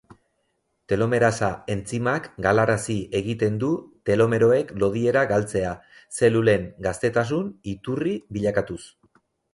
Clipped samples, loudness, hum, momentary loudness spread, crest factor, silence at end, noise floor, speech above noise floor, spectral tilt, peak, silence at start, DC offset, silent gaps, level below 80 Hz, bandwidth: under 0.1%; -23 LUFS; none; 10 LU; 18 dB; 0.7 s; -73 dBFS; 50 dB; -6 dB/octave; -6 dBFS; 0.9 s; under 0.1%; none; -50 dBFS; 11.5 kHz